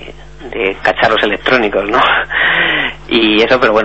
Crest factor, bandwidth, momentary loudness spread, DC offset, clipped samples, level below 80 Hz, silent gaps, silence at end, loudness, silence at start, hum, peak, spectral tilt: 12 dB; 8.2 kHz; 6 LU; 1%; under 0.1%; -38 dBFS; none; 0 s; -11 LUFS; 0 s; none; 0 dBFS; -5 dB/octave